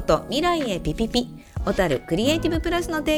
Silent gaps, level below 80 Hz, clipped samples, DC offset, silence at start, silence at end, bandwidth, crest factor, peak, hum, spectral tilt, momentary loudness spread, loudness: none; -36 dBFS; under 0.1%; under 0.1%; 0 s; 0 s; 19 kHz; 18 dB; -6 dBFS; none; -5 dB/octave; 5 LU; -23 LUFS